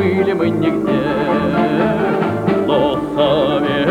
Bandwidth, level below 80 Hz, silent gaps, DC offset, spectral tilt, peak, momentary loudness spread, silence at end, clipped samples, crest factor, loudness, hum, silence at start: 14 kHz; -44 dBFS; none; under 0.1%; -7.5 dB/octave; -2 dBFS; 2 LU; 0 s; under 0.1%; 12 dB; -16 LUFS; none; 0 s